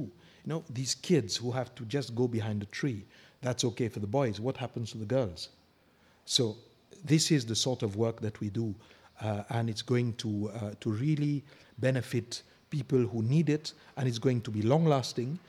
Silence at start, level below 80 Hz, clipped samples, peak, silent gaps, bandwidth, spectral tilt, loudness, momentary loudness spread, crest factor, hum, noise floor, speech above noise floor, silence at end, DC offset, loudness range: 0 s; -72 dBFS; under 0.1%; -12 dBFS; none; 15 kHz; -5.5 dB/octave; -32 LUFS; 11 LU; 20 dB; none; -65 dBFS; 34 dB; 0.1 s; under 0.1%; 3 LU